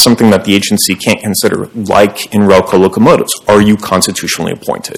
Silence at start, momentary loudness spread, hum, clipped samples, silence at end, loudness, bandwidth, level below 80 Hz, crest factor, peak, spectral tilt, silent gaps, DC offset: 0 s; 7 LU; none; 4%; 0 s; -10 LUFS; over 20 kHz; -40 dBFS; 10 dB; 0 dBFS; -4 dB/octave; none; under 0.1%